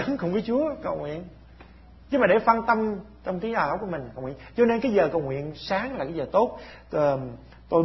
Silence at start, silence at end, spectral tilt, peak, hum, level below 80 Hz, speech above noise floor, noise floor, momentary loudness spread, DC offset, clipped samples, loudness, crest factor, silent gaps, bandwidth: 0 s; 0 s; -8 dB/octave; -4 dBFS; none; -52 dBFS; 24 dB; -49 dBFS; 14 LU; under 0.1%; under 0.1%; -25 LUFS; 22 dB; none; 6 kHz